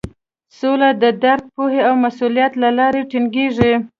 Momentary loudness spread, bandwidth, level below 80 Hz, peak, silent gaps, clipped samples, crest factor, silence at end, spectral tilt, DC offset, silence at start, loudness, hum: 5 LU; 7 kHz; -46 dBFS; 0 dBFS; none; under 0.1%; 16 dB; 0.1 s; -7 dB/octave; under 0.1%; 0.05 s; -16 LUFS; none